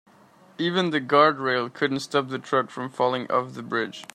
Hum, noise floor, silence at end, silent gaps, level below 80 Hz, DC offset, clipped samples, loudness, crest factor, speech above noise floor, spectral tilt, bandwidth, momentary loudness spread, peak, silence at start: none; -54 dBFS; 0.1 s; none; -72 dBFS; under 0.1%; under 0.1%; -24 LUFS; 20 dB; 30 dB; -5 dB/octave; 14 kHz; 9 LU; -4 dBFS; 0.6 s